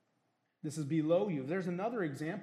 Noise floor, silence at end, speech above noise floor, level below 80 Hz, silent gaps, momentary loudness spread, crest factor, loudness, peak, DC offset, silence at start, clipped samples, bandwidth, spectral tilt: -79 dBFS; 0 s; 45 dB; -84 dBFS; none; 10 LU; 16 dB; -35 LUFS; -20 dBFS; under 0.1%; 0.65 s; under 0.1%; 13 kHz; -7 dB/octave